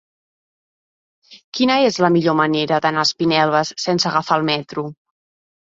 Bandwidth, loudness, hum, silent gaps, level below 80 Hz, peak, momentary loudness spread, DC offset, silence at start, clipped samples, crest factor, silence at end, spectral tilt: 7.8 kHz; -17 LUFS; none; 1.44-1.52 s; -62 dBFS; -2 dBFS; 9 LU; under 0.1%; 1.3 s; under 0.1%; 18 dB; 0.75 s; -4.5 dB/octave